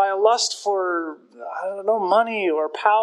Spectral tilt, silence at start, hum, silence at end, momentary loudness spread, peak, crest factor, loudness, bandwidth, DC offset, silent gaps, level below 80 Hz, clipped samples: -2 dB/octave; 0 s; none; 0 s; 13 LU; -4 dBFS; 18 dB; -21 LUFS; 12 kHz; under 0.1%; none; -86 dBFS; under 0.1%